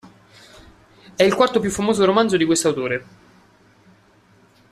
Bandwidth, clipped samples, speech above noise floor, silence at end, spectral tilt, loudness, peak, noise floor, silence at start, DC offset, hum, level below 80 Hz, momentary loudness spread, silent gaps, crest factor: 14 kHz; under 0.1%; 36 dB; 1.7 s; -4 dB/octave; -18 LUFS; -2 dBFS; -54 dBFS; 0.05 s; under 0.1%; none; -54 dBFS; 9 LU; none; 18 dB